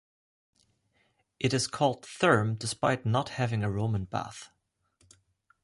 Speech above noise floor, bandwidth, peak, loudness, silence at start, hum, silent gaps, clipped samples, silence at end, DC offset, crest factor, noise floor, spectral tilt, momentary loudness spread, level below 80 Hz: 44 dB; 11.5 kHz; -10 dBFS; -29 LUFS; 1.4 s; none; none; under 0.1%; 1.15 s; under 0.1%; 22 dB; -72 dBFS; -5 dB/octave; 10 LU; -58 dBFS